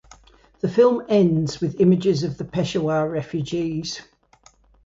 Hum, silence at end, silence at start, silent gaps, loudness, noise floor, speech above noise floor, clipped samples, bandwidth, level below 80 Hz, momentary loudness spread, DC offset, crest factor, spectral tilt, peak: none; 0.85 s; 0.65 s; none; -21 LUFS; -56 dBFS; 35 dB; under 0.1%; 7.8 kHz; -54 dBFS; 10 LU; under 0.1%; 16 dB; -7 dB/octave; -4 dBFS